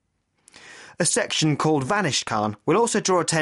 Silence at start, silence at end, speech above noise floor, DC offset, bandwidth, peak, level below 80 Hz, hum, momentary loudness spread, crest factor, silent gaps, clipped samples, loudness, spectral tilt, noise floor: 0.65 s; 0 s; 39 dB; under 0.1%; 11.5 kHz; -8 dBFS; -62 dBFS; none; 4 LU; 14 dB; none; under 0.1%; -22 LUFS; -3.5 dB/octave; -61 dBFS